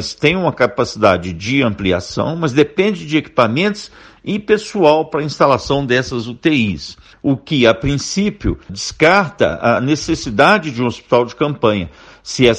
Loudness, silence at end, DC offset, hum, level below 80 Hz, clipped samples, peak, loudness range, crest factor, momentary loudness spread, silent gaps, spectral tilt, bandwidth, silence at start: -15 LUFS; 0 s; under 0.1%; none; -38 dBFS; under 0.1%; 0 dBFS; 2 LU; 16 dB; 10 LU; none; -5 dB/octave; 11 kHz; 0 s